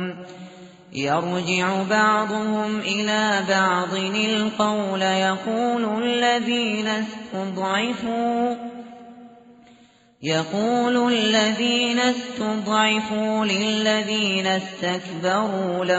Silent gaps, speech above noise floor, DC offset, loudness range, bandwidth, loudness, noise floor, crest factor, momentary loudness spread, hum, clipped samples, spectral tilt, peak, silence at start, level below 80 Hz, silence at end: none; 32 dB; under 0.1%; 5 LU; 8 kHz; -22 LUFS; -54 dBFS; 16 dB; 9 LU; none; under 0.1%; -2.5 dB/octave; -6 dBFS; 0 s; -64 dBFS; 0 s